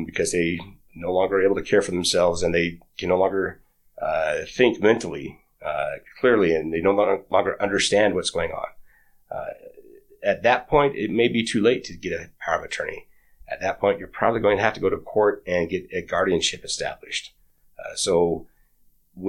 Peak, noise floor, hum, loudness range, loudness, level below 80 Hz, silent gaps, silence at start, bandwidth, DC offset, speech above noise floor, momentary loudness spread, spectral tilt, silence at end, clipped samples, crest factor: -2 dBFS; -59 dBFS; none; 3 LU; -23 LUFS; -50 dBFS; none; 0 s; 14 kHz; under 0.1%; 37 dB; 13 LU; -4 dB/octave; 0 s; under 0.1%; 20 dB